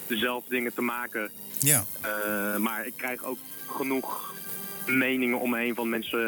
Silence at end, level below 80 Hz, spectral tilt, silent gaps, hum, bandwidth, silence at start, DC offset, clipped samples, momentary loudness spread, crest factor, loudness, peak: 0 s; -72 dBFS; -3 dB/octave; none; none; 19.5 kHz; 0 s; under 0.1%; under 0.1%; 11 LU; 24 dB; -28 LUFS; -4 dBFS